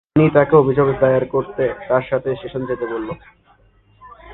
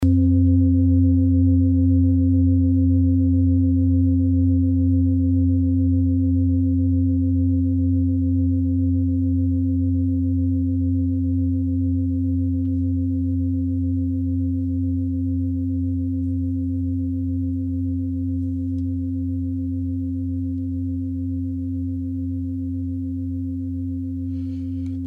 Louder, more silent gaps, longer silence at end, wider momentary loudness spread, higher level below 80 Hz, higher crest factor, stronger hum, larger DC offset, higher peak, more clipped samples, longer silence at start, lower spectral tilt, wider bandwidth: first, -17 LUFS vs -21 LUFS; neither; about the same, 0 s vs 0 s; first, 12 LU vs 9 LU; second, -46 dBFS vs -36 dBFS; first, 18 dB vs 10 dB; neither; neither; first, 0 dBFS vs -8 dBFS; neither; first, 0.15 s vs 0 s; second, -11 dB/octave vs -13 dB/octave; first, 4.1 kHz vs 0.9 kHz